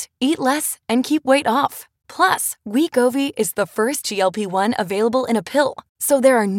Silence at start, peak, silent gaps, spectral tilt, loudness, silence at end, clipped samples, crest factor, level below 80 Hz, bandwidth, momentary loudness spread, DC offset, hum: 0 s; -2 dBFS; 5.89-5.95 s; -3.5 dB/octave; -19 LUFS; 0 s; under 0.1%; 18 dB; -66 dBFS; 17 kHz; 5 LU; under 0.1%; none